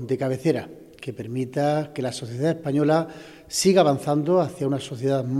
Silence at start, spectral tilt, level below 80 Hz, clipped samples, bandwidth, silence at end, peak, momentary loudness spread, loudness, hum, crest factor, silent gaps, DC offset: 0 s; -5.5 dB/octave; -64 dBFS; under 0.1%; 15.5 kHz; 0 s; -6 dBFS; 16 LU; -23 LUFS; none; 18 dB; none; under 0.1%